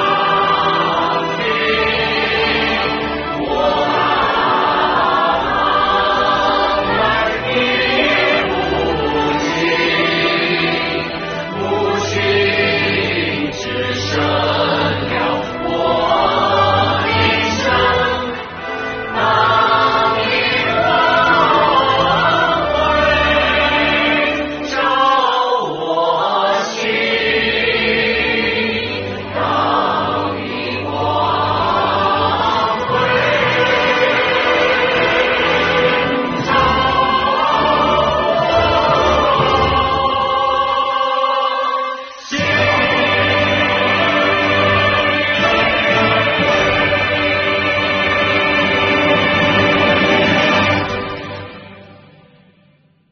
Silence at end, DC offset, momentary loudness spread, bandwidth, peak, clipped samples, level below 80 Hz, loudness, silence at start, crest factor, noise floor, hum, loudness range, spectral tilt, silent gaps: 1.2 s; under 0.1%; 6 LU; 6.6 kHz; -2 dBFS; under 0.1%; -38 dBFS; -14 LUFS; 0 s; 14 dB; -53 dBFS; none; 3 LU; -2 dB/octave; none